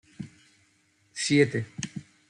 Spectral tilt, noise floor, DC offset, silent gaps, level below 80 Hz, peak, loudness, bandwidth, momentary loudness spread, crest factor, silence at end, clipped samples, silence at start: -4.5 dB/octave; -67 dBFS; under 0.1%; none; -68 dBFS; -8 dBFS; -27 LUFS; 11 kHz; 21 LU; 22 dB; 0.3 s; under 0.1%; 0.2 s